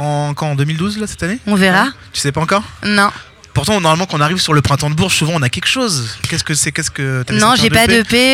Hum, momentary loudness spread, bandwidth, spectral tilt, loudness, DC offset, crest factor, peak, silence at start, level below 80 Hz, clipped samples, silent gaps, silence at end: none; 9 LU; 17.5 kHz; -4 dB/octave; -14 LUFS; under 0.1%; 14 dB; 0 dBFS; 0 s; -38 dBFS; under 0.1%; none; 0 s